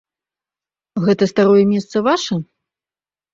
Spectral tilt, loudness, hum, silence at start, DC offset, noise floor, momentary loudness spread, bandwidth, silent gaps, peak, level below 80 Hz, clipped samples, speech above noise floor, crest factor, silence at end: -6 dB/octave; -16 LUFS; none; 0.95 s; under 0.1%; under -90 dBFS; 11 LU; 7.8 kHz; none; -2 dBFS; -60 dBFS; under 0.1%; over 75 dB; 16 dB; 0.9 s